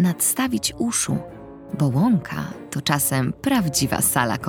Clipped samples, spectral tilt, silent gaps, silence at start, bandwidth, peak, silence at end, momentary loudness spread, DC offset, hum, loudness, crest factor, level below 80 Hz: under 0.1%; -4 dB/octave; none; 0 s; 19 kHz; -4 dBFS; 0 s; 11 LU; under 0.1%; none; -21 LUFS; 18 dB; -50 dBFS